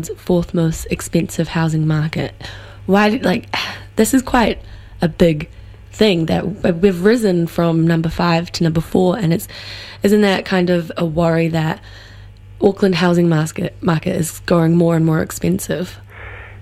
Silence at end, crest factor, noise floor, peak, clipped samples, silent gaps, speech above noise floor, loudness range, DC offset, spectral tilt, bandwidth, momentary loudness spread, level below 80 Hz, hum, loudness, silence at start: 0 s; 16 dB; -37 dBFS; 0 dBFS; under 0.1%; none; 22 dB; 2 LU; under 0.1%; -6 dB/octave; 15 kHz; 12 LU; -38 dBFS; none; -17 LUFS; 0 s